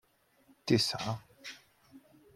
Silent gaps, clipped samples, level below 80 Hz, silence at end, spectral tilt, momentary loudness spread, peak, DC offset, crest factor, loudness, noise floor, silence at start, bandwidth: none; under 0.1%; -70 dBFS; 0.4 s; -4.5 dB/octave; 19 LU; -14 dBFS; under 0.1%; 24 dB; -32 LUFS; -67 dBFS; 0.65 s; 16 kHz